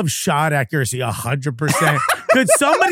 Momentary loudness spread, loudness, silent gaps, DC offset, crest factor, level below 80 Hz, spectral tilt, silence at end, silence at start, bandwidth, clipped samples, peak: 8 LU; -17 LUFS; none; under 0.1%; 16 dB; -54 dBFS; -4 dB/octave; 0 s; 0 s; 16.5 kHz; under 0.1%; 0 dBFS